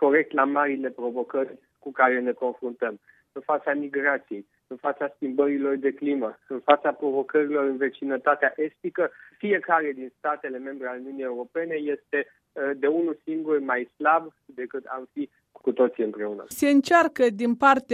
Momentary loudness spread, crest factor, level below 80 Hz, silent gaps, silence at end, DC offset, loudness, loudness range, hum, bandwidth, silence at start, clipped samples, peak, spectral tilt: 13 LU; 22 dB; -76 dBFS; none; 0 s; under 0.1%; -25 LUFS; 4 LU; none; 13.5 kHz; 0 s; under 0.1%; -2 dBFS; -5 dB/octave